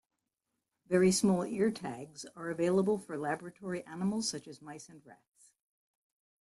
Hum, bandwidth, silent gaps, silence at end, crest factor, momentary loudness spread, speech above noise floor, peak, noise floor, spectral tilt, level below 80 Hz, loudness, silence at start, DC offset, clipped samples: none; 12.5 kHz; none; 1.3 s; 20 dB; 20 LU; 53 dB; -16 dBFS; -86 dBFS; -5 dB/octave; -70 dBFS; -33 LUFS; 0.9 s; under 0.1%; under 0.1%